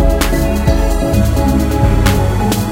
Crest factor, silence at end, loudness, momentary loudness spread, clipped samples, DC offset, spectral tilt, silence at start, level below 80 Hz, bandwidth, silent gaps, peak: 12 dB; 0 s; -14 LUFS; 2 LU; under 0.1%; under 0.1%; -6 dB/octave; 0 s; -16 dBFS; 17 kHz; none; 0 dBFS